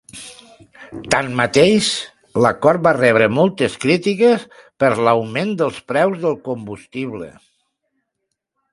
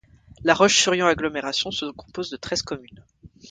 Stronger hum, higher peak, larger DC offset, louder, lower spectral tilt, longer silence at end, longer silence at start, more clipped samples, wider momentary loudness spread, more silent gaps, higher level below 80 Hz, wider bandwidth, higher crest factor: neither; about the same, 0 dBFS vs -2 dBFS; neither; first, -17 LUFS vs -21 LUFS; first, -5 dB/octave vs -2.5 dB/octave; first, 1.45 s vs 0 s; second, 0.15 s vs 0.4 s; neither; about the same, 17 LU vs 17 LU; neither; about the same, -54 dBFS vs -52 dBFS; first, 11.5 kHz vs 9.6 kHz; about the same, 18 dB vs 22 dB